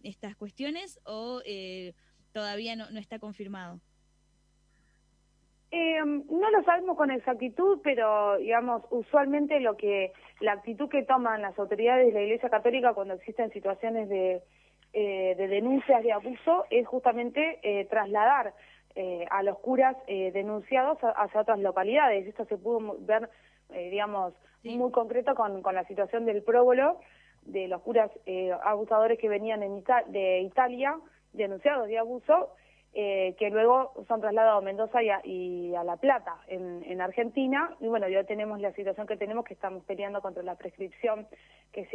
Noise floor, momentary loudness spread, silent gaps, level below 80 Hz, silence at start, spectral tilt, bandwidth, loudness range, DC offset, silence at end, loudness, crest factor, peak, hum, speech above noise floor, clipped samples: -68 dBFS; 14 LU; none; -70 dBFS; 0.05 s; -6 dB/octave; 9.8 kHz; 8 LU; under 0.1%; 0 s; -28 LUFS; 20 dB; -10 dBFS; none; 40 dB; under 0.1%